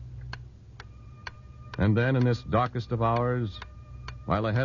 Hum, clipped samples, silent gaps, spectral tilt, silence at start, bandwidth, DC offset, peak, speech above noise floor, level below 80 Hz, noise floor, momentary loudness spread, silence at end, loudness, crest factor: none; under 0.1%; none; -8.5 dB/octave; 0 s; 7 kHz; under 0.1%; -12 dBFS; 21 dB; -46 dBFS; -47 dBFS; 23 LU; 0 s; -27 LUFS; 16 dB